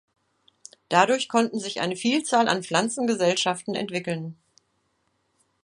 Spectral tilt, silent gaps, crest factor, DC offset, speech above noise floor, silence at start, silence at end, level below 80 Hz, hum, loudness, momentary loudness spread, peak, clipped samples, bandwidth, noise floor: -3.5 dB/octave; none; 24 dB; under 0.1%; 48 dB; 0.9 s; 1.3 s; -74 dBFS; none; -24 LUFS; 8 LU; -2 dBFS; under 0.1%; 11.5 kHz; -71 dBFS